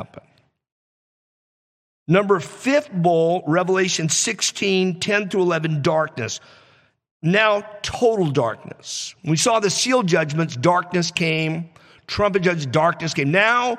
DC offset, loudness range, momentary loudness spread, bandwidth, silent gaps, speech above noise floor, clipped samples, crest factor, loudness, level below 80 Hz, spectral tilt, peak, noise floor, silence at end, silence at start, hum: under 0.1%; 3 LU; 11 LU; 14.5 kHz; 0.72-2.06 s, 7.11-7.20 s; over 70 dB; under 0.1%; 18 dB; -20 LUFS; -56 dBFS; -4 dB/octave; -4 dBFS; under -90 dBFS; 0 s; 0 s; none